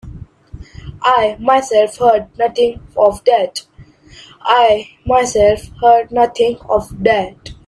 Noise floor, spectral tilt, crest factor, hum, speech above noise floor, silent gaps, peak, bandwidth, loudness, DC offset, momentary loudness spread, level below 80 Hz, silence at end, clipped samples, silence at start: -42 dBFS; -4 dB/octave; 14 dB; none; 28 dB; none; 0 dBFS; 12.5 kHz; -14 LUFS; under 0.1%; 7 LU; -40 dBFS; 0.15 s; under 0.1%; 0.05 s